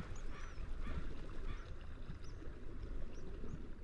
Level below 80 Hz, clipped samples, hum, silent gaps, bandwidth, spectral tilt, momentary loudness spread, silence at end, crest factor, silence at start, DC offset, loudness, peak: -46 dBFS; under 0.1%; none; none; 7.2 kHz; -6.5 dB/octave; 5 LU; 0 s; 12 dB; 0 s; under 0.1%; -51 LUFS; -30 dBFS